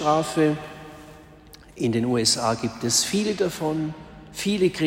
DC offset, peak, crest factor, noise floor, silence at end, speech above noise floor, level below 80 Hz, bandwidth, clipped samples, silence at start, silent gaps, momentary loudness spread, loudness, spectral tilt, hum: under 0.1%; -6 dBFS; 20 dB; -48 dBFS; 0 s; 25 dB; -54 dBFS; 16 kHz; under 0.1%; 0 s; none; 19 LU; -23 LUFS; -4 dB/octave; none